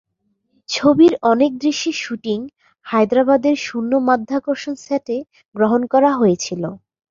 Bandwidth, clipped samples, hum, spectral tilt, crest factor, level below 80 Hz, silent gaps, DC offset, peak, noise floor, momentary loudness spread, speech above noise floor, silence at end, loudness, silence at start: 7.6 kHz; under 0.1%; none; -5 dB/octave; 16 dB; -60 dBFS; 5.48-5.52 s; under 0.1%; -2 dBFS; -68 dBFS; 13 LU; 51 dB; 0.35 s; -17 LUFS; 0.7 s